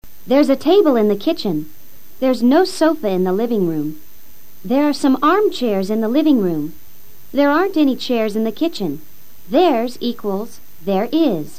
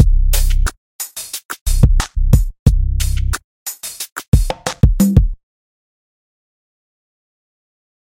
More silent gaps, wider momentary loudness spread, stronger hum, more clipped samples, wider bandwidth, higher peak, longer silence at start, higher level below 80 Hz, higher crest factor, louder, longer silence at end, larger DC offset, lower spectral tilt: second, none vs 0.78-0.99 s, 1.45-1.49 s, 1.61-1.66 s, 2.59-2.66 s, 3.44-3.66 s, 4.12-4.16 s, 4.28-4.32 s; about the same, 11 LU vs 12 LU; neither; neither; about the same, 15.5 kHz vs 17 kHz; about the same, -2 dBFS vs 0 dBFS; about the same, 0 s vs 0 s; second, -56 dBFS vs -18 dBFS; about the same, 14 dB vs 16 dB; about the same, -17 LUFS vs -18 LUFS; second, 0.1 s vs 2.7 s; first, 4% vs under 0.1%; about the same, -6 dB/octave vs -5.5 dB/octave